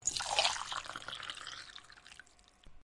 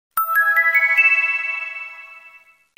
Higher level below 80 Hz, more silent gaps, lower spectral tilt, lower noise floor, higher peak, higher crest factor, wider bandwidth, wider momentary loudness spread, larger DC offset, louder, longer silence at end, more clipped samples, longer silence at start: first, -64 dBFS vs -72 dBFS; neither; about the same, 1 dB/octave vs 2 dB/octave; first, -60 dBFS vs -49 dBFS; second, -12 dBFS vs -4 dBFS; first, 28 dB vs 16 dB; second, 12 kHz vs 16.5 kHz; first, 23 LU vs 16 LU; neither; second, -36 LUFS vs -15 LUFS; second, 0 s vs 0.5 s; neither; second, 0 s vs 0.15 s